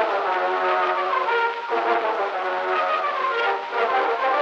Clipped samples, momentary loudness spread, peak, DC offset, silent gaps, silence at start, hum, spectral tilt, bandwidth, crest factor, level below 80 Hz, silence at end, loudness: under 0.1%; 3 LU; -8 dBFS; under 0.1%; none; 0 s; none; -3 dB/octave; 8.4 kHz; 16 dB; -90 dBFS; 0 s; -22 LUFS